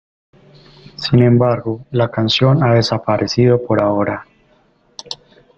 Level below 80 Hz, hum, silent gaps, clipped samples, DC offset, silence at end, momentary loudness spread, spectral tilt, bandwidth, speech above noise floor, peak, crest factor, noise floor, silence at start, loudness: -48 dBFS; none; none; under 0.1%; under 0.1%; 0.45 s; 18 LU; -7 dB/octave; 7.6 kHz; 41 dB; 0 dBFS; 16 dB; -55 dBFS; 1 s; -15 LUFS